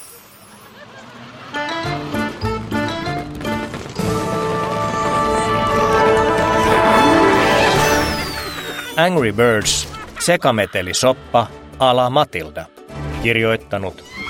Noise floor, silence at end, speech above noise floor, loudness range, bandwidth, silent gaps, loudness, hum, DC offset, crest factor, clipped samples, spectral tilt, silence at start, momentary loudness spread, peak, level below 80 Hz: -42 dBFS; 0 s; 25 dB; 9 LU; 16.5 kHz; none; -17 LUFS; none; under 0.1%; 18 dB; under 0.1%; -4 dB/octave; 0 s; 14 LU; 0 dBFS; -38 dBFS